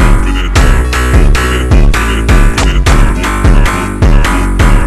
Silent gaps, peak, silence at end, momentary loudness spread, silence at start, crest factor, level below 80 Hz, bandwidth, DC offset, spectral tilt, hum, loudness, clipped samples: none; 0 dBFS; 0 s; 2 LU; 0 s; 6 dB; -8 dBFS; 13 kHz; 2%; -5.5 dB/octave; none; -10 LUFS; 0.3%